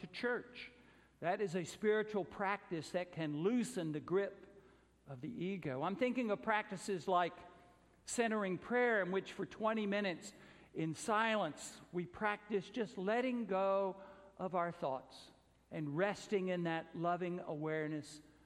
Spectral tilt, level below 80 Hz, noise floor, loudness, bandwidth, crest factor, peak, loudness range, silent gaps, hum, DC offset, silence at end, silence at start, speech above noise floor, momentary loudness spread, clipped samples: -5.5 dB/octave; -76 dBFS; -66 dBFS; -39 LUFS; 14 kHz; 20 dB; -20 dBFS; 3 LU; none; none; under 0.1%; 0.25 s; 0 s; 27 dB; 13 LU; under 0.1%